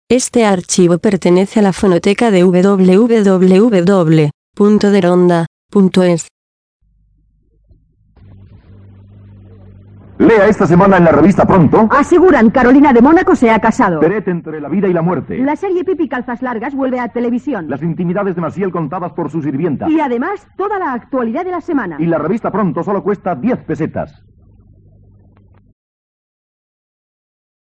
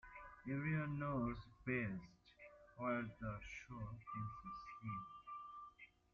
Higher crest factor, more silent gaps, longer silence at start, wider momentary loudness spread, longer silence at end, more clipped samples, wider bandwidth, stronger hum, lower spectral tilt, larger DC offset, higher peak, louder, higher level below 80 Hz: second, 12 dB vs 18 dB; first, 4.34-4.53 s, 5.47-5.69 s, 6.31-6.80 s vs none; about the same, 0.1 s vs 0.05 s; second, 11 LU vs 18 LU; first, 3.65 s vs 0.25 s; first, 0.1% vs under 0.1%; first, 10.5 kHz vs 7.2 kHz; neither; about the same, -6.5 dB/octave vs -7 dB/octave; neither; first, 0 dBFS vs -28 dBFS; first, -12 LUFS vs -47 LUFS; first, -42 dBFS vs -66 dBFS